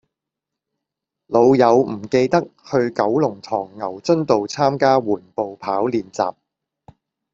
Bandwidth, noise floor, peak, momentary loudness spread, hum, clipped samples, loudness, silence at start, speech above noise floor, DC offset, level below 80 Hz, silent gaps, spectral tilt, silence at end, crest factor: 7.6 kHz; -84 dBFS; -2 dBFS; 11 LU; none; under 0.1%; -19 LUFS; 1.3 s; 66 dB; under 0.1%; -60 dBFS; none; -6.5 dB/octave; 1 s; 18 dB